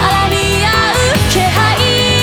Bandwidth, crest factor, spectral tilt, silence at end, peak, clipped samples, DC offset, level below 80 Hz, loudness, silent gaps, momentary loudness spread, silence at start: 19.5 kHz; 10 dB; -3.5 dB/octave; 0 s; 0 dBFS; under 0.1%; 0.2%; -24 dBFS; -11 LUFS; none; 1 LU; 0 s